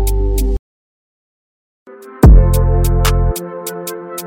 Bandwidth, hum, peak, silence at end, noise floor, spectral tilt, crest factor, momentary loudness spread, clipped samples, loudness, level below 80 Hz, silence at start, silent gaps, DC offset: 17 kHz; none; 0 dBFS; 0 s; under -90 dBFS; -6.5 dB/octave; 14 dB; 16 LU; under 0.1%; -14 LUFS; -14 dBFS; 0 s; 0.59-1.86 s; under 0.1%